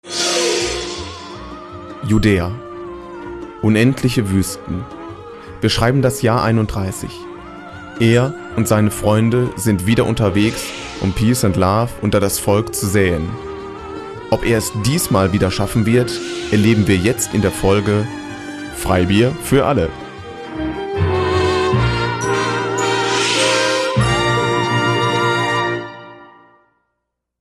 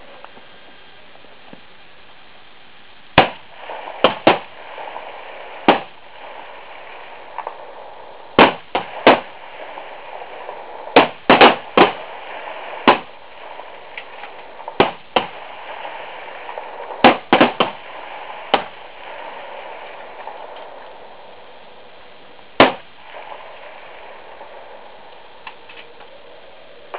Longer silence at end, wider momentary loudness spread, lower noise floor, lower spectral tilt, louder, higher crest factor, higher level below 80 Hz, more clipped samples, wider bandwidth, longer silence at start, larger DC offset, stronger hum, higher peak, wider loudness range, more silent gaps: first, 1.15 s vs 0 s; second, 16 LU vs 24 LU; first, -75 dBFS vs -45 dBFS; second, -5 dB/octave vs -8 dB/octave; about the same, -16 LUFS vs -15 LUFS; about the same, 16 dB vs 20 dB; first, -36 dBFS vs -52 dBFS; neither; first, 13.5 kHz vs 4 kHz; second, 0.05 s vs 3.15 s; second, under 0.1% vs 1%; neither; about the same, -2 dBFS vs 0 dBFS; second, 3 LU vs 15 LU; neither